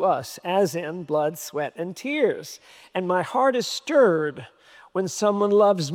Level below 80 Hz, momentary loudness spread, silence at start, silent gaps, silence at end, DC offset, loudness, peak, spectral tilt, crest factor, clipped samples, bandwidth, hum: -76 dBFS; 13 LU; 0 s; none; 0 s; under 0.1%; -23 LUFS; -8 dBFS; -4.5 dB/octave; 16 dB; under 0.1%; 17.5 kHz; none